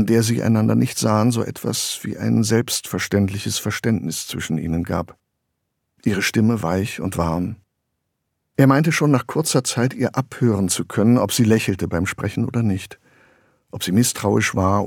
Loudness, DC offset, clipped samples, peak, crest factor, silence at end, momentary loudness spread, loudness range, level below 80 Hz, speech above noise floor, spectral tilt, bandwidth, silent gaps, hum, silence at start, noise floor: -20 LUFS; under 0.1%; under 0.1%; -2 dBFS; 18 dB; 0 s; 9 LU; 5 LU; -48 dBFS; 56 dB; -5 dB/octave; 18.5 kHz; none; none; 0 s; -75 dBFS